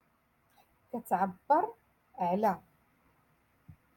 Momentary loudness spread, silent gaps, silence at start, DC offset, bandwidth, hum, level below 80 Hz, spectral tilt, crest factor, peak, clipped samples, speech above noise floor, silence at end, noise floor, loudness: 14 LU; none; 0.95 s; under 0.1%; 17.5 kHz; none; -74 dBFS; -7.5 dB/octave; 20 dB; -14 dBFS; under 0.1%; 41 dB; 0.25 s; -72 dBFS; -32 LUFS